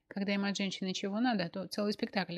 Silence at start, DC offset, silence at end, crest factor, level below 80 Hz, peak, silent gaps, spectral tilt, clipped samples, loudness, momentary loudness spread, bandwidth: 0.15 s; under 0.1%; 0 s; 18 dB; -78 dBFS; -16 dBFS; none; -5 dB/octave; under 0.1%; -34 LUFS; 4 LU; 12.5 kHz